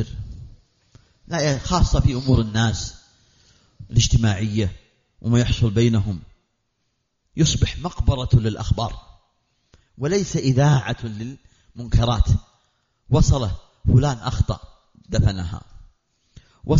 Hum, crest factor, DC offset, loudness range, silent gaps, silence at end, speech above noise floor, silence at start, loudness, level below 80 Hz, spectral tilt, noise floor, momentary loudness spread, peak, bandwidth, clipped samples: none; 16 dB; under 0.1%; 2 LU; none; 0 s; 53 dB; 0 s; -21 LUFS; -30 dBFS; -6.5 dB/octave; -72 dBFS; 15 LU; -6 dBFS; 7.6 kHz; under 0.1%